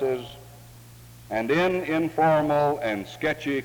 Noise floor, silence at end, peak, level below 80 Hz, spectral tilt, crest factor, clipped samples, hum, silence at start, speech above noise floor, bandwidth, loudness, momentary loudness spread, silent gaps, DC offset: -47 dBFS; 0 s; -10 dBFS; -56 dBFS; -6.5 dB/octave; 14 dB; under 0.1%; none; 0 s; 23 dB; over 20 kHz; -24 LUFS; 11 LU; none; under 0.1%